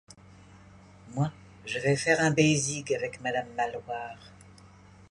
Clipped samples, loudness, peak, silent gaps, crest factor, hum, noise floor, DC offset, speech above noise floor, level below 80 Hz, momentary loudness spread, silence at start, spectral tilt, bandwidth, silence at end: under 0.1%; -28 LUFS; -10 dBFS; none; 20 dB; none; -53 dBFS; under 0.1%; 25 dB; -62 dBFS; 16 LU; 0.55 s; -4.5 dB/octave; 11.5 kHz; 0.45 s